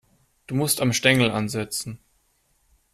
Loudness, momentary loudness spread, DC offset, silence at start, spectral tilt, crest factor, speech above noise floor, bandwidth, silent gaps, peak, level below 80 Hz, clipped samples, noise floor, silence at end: -22 LUFS; 14 LU; under 0.1%; 0.5 s; -4 dB/octave; 22 dB; 44 dB; 15 kHz; none; -2 dBFS; -58 dBFS; under 0.1%; -66 dBFS; 0.95 s